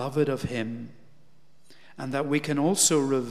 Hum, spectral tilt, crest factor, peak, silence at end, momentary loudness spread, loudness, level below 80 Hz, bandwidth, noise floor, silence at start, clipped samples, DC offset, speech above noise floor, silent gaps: none; -4 dB/octave; 18 dB; -8 dBFS; 0 s; 17 LU; -25 LUFS; -60 dBFS; 15.5 kHz; -63 dBFS; 0 s; under 0.1%; 0.4%; 37 dB; none